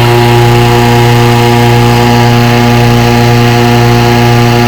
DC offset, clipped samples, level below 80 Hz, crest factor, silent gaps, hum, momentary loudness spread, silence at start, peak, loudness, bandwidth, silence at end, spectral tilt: 3%; 1%; -24 dBFS; 4 dB; none; 60 Hz at -20 dBFS; 1 LU; 0 s; 0 dBFS; -5 LUFS; 19 kHz; 0 s; -6 dB/octave